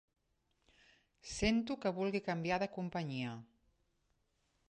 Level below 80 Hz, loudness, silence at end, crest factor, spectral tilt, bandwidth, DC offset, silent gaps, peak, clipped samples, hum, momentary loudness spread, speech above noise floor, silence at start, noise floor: -60 dBFS; -38 LUFS; 1.25 s; 20 dB; -5.5 dB/octave; 10.5 kHz; under 0.1%; none; -22 dBFS; under 0.1%; none; 12 LU; 43 dB; 1.25 s; -80 dBFS